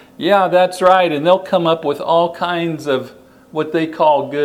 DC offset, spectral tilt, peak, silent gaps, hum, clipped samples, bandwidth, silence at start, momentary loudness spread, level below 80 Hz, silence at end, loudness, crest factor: under 0.1%; -5.5 dB/octave; 0 dBFS; none; none; under 0.1%; 15 kHz; 0.2 s; 9 LU; -62 dBFS; 0 s; -15 LUFS; 16 dB